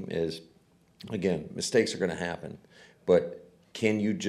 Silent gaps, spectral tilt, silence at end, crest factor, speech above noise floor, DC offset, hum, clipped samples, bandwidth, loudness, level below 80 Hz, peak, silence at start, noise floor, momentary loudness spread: none; -5 dB/octave; 0 s; 18 dB; 29 dB; under 0.1%; none; under 0.1%; 13.5 kHz; -29 LUFS; -64 dBFS; -12 dBFS; 0 s; -58 dBFS; 19 LU